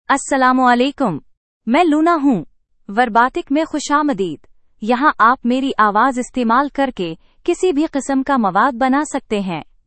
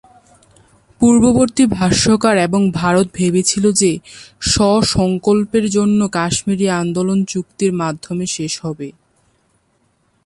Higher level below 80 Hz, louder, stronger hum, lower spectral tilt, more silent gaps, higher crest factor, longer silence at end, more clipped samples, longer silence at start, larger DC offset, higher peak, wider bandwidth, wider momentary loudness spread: second, -50 dBFS vs -40 dBFS; about the same, -16 LUFS vs -15 LUFS; neither; about the same, -4.5 dB/octave vs -4.5 dB/octave; first, 1.37-1.61 s vs none; about the same, 16 dB vs 14 dB; second, 0.25 s vs 1.35 s; neither; second, 0.1 s vs 1 s; neither; about the same, 0 dBFS vs -2 dBFS; second, 8.8 kHz vs 11.5 kHz; about the same, 10 LU vs 10 LU